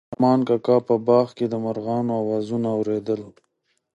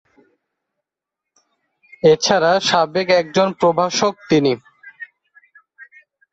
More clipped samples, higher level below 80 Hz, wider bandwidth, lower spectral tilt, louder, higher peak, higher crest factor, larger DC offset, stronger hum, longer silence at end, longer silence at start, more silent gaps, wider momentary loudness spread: neither; second, -66 dBFS vs -60 dBFS; about the same, 8.2 kHz vs 8.2 kHz; first, -9 dB/octave vs -4 dB/octave; second, -22 LUFS vs -16 LUFS; second, -6 dBFS vs -2 dBFS; about the same, 16 dB vs 18 dB; neither; neither; first, 0.65 s vs 0.5 s; second, 0.1 s vs 2.05 s; neither; second, 7 LU vs 20 LU